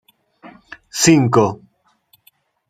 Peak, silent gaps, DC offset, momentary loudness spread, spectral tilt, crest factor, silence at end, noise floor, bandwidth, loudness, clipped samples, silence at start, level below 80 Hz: 0 dBFS; none; under 0.1%; 17 LU; -4.5 dB/octave; 20 dB; 1.15 s; -58 dBFS; 15.5 kHz; -15 LUFS; under 0.1%; 0.45 s; -58 dBFS